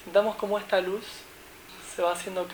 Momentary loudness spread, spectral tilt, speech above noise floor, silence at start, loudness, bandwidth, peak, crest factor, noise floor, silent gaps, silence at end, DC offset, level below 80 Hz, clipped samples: 20 LU; -3.5 dB/octave; 20 dB; 0 s; -28 LUFS; over 20 kHz; -10 dBFS; 20 dB; -48 dBFS; none; 0 s; under 0.1%; -62 dBFS; under 0.1%